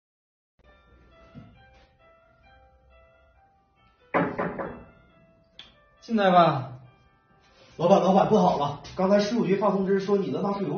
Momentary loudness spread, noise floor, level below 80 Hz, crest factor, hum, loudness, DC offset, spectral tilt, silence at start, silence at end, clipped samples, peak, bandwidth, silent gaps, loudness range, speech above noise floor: 13 LU; -63 dBFS; -60 dBFS; 22 dB; none; -24 LUFS; under 0.1%; -5.5 dB/octave; 1.35 s; 0 s; under 0.1%; -6 dBFS; 6.6 kHz; none; 11 LU; 41 dB